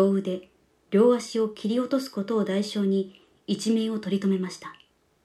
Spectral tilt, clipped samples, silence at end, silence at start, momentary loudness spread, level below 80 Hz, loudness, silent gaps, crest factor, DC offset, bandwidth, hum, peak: -6.5 dB/octave; under 0.1%; 0.55 s; 0 s; 14 LU; -74 dBFS; -26 LUFS; none; 16 dB; under 0.1%; 13.5 kHz; none; -10 dBFS